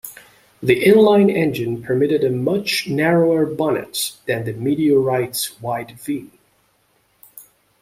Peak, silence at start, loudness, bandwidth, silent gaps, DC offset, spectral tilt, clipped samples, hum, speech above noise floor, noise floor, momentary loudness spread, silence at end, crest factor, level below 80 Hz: -2 dBFS; 0.05 s; -18 LUFS; 16 kHz; none; under 0.1%; -5.5 dB/octave; under 0.1%; none; 44 dB; -62 dBFS; 13 LU; 0.4 s; 18 dB; -58 dBFS